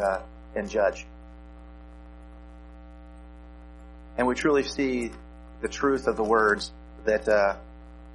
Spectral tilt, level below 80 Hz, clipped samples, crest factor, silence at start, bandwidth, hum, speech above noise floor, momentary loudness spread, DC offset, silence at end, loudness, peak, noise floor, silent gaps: -5 dB/octave; -46 dBFS; under 0.1%; 20 dB; 0 s; 11.5 kHz; 60 Hz at -45 dBFS; 20 dB; 25 LU; under 0.1%; 0 s; -26 LUFS; -8 dBFS; -45 dBFS; none